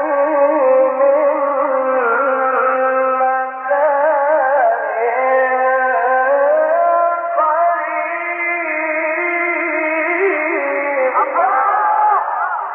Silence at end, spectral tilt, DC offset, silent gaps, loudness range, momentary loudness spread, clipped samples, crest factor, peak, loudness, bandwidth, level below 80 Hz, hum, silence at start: 0 s; -8 dB/octave; under 0.1%; none; 2 LU; 4 LU; under 0.1%; 12 dB; -4 dBFS; -15 LUFS; 3.3 kHz; under -90 dBFS; none; 0 s